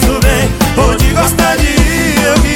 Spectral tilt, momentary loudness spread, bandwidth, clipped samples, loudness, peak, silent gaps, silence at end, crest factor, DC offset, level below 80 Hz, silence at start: -4.5 dB/octave; 1 LU; 17.5 kHz; under 0.1%; -10 LUFS; 0 dBFS; none; 0 s; 10 dB; under 0.1%; -14 dBFS; 0 s